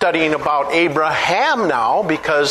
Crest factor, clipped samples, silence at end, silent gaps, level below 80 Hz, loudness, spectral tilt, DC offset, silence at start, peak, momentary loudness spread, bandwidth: 14 dB; under 0.1%; 0 s; none; -52 dBFS; -16 LUFS; -4 dB/octave; under 0.1%; 0 s; -2 dBFS; 2 LU; 13 kHz